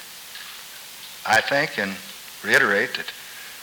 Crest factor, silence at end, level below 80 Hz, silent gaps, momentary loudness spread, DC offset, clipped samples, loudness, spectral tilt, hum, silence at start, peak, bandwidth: 20 dB; 0 s; -66 dBFS; none; 19 LU; under 0.1%; under 0.1%; -21 LUFS; -2.5 dB/octave; none; 0 s; -4 dBFS; over 20 kHz